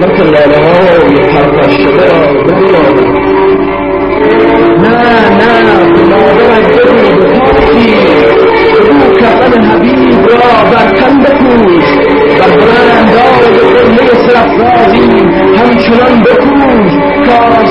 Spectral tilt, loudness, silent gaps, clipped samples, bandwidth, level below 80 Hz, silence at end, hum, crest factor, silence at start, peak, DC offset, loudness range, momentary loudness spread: -7.5 dB/octave; -5 LUFS; none; 2%; 7.8 kHz; -28 dBFS; 0 s; none; 4 dB; 0 s; 0 dBFS; under 0.1%; 2 LU; 2 LU